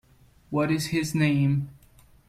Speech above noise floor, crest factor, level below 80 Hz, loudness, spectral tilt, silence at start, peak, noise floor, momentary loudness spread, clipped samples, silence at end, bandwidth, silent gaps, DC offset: 32 dB; 16 dB; -56 dBFS; -25 LUFS; -6 dB/octave; 0.5 s; -10 dBFS; -56 dBFS; 8 LU; under 0.1%; 0.55 s; 15.5 kHz; none; under 0.1%